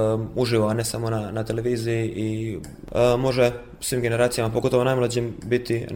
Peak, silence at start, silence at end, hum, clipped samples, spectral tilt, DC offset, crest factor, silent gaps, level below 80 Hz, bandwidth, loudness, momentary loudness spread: -8 dBFS; 0 s; 0 s; none; under 0.1%; -5.5 dB/octave; under 0.1%; 16 dB; none; -46 dBFS; 17 kHz; -23 LUFS; 7 LU